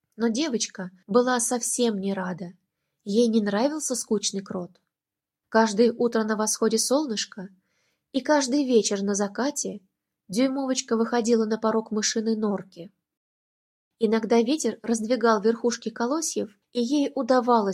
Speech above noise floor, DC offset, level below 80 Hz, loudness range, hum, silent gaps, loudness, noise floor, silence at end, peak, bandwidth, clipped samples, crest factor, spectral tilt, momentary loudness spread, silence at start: 65 dB; under 0.1%; -74 dBFS; 2 LU; none; 13.17-13.91 s; -24 LUFS; -89 dBFS; 0 s; -6 dBFS; 15.5 kHz; under 0.1%; 20 dB; -3.5 dB/octave; 11 LU; 0.2 s